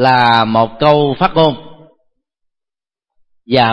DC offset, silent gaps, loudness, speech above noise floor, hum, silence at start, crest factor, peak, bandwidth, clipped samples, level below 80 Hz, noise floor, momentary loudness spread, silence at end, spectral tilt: under 0.1%; none; -12 LUFS; 76 dB; none; 0 s; 14 dB; 0 dBFS; 11 kHz; 0.1%; -44 dBFS; -87 dBFS; 5 LU; 0 s; -7.5 dB/octave